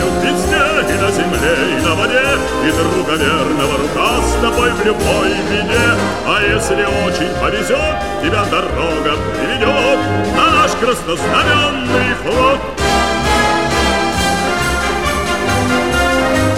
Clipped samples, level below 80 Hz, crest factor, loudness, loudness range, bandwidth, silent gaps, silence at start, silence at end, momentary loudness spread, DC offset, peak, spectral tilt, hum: under 0.1%; -28 dBFS; 14 dB; -14 LUFS; 2 LU; 16.5 kHz; none; 0 s; 0 s; 3 LU; 2%; 0 dBFS; -4 dB/octave; none